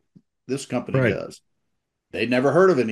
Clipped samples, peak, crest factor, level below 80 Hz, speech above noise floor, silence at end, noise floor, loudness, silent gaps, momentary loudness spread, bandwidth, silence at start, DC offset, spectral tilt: under 0.1%; -6 dBFS; 18 dB; -64 dBFS; 56 dB; 0 s; -77 dBFS; -22 LUFS; none; 15 LU; 12 kHz; 0.5 s; under 0.1%; -6.5 dB/octave